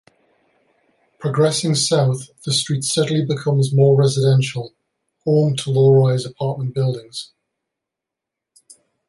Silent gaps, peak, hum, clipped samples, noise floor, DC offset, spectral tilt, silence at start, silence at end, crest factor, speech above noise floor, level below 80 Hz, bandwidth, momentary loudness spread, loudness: none; -4 dBFS; none; under 0.1%; -84 dBFS; under 0.1%; -5.5 dB/octave; 1.2 s; 1.85 s; 16 dB; 67 dB; -60 dBFS; 11.5 kHz; 14 LU; -18 LUFS